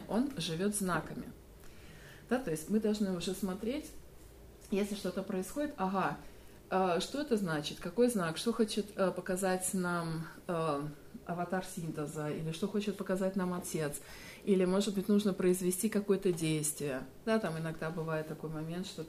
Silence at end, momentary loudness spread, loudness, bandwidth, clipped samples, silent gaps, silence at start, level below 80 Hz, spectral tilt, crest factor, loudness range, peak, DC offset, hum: 0 s; 11 LU; -35 LUFS; 15.5 kHz; under 0.1%; none; 0 s; -60 dBFS; -5 dB/octave; 18 dB; 5 LU; -18 dBFS; under 0.1%; none